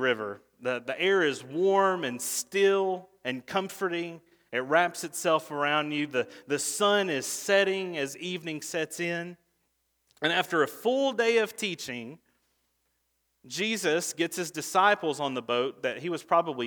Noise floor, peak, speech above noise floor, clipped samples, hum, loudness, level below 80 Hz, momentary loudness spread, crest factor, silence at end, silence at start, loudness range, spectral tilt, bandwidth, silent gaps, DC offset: -76 dBFS; -8 dBFS; 48 dB; under 0.1%; none; -28 LUFS; -80 dBFS; 10 LU; 20 dB; 0 s; 0 s; 3 LU; -3 dB/octave; over 20 kHz; none; under 0.1%